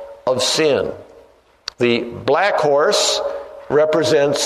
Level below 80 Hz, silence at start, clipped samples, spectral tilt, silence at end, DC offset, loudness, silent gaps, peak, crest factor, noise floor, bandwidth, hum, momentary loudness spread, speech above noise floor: -56 dBFS; 0 s; under 0.1%; -3 dB/octave; 0 s; under 0.1%; -17 LUFS; none; -4 dBFS; 14 dB; -49 dBFS; 13.5 kHz; none; 13 LU; 33 dB